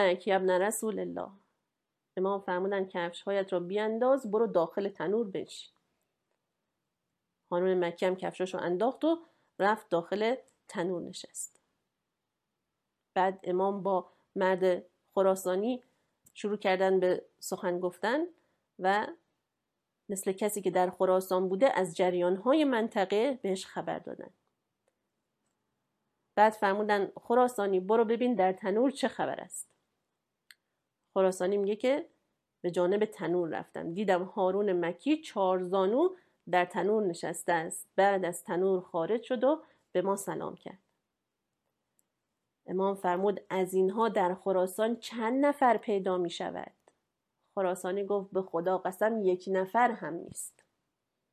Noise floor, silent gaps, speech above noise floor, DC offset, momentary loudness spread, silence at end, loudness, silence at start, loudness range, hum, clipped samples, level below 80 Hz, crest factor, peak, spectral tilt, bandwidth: -86 dBFS; none; 56 dB; under 0.1%; 12 LU; 0.85 s; -31 LUFS; 0 s; 6 LU; none; under 0.1%; -82 dBFS; 22 dB; -10 dBFS; -5 dB/octave; 15 kHz